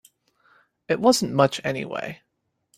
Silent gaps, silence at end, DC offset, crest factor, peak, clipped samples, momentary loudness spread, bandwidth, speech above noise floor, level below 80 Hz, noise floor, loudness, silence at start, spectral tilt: none; 0.65 s; under 0.1%; 22 dB; -2 dBFS; under 0.1%; 15 LU; 16 kHz; 49 dB; -64 dBFS; -71 dBFS; -22 LUFS; 0.9 s; -4.5 dB/octave